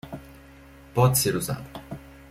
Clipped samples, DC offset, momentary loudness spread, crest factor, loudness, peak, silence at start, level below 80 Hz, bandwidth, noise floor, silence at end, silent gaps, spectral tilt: under 0.1%; under 0.1%; 21 LU; 22 dB; -24 LUFS; -6 dBFS; 0.05 s; -50 dBFS; 16.5 kHz; -48 dBFS; 0.05 s; none; -4.5 dB/octave